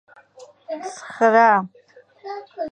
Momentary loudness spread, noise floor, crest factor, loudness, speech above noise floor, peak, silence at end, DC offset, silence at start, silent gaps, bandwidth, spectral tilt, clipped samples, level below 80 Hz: 21 LU; -48 dBFS; 20 dB; -17 LUFS; 30 dB; -2 dBFS; 0.05 s; under 0.1%; 0.4 s; none; 9.6 kHz; -5 dB/octave; under 0.1%; -74 dBFS